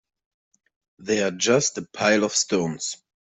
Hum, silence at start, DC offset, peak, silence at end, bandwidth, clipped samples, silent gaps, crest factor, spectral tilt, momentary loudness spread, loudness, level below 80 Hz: none; 1 s; under 0.1%; -6 dBFS; 0.4 s; 8.4 kHz; under 0.1%; none; 18 dB; -3 dB/octave; 11 LU; -22 LUFS; -66 dBFS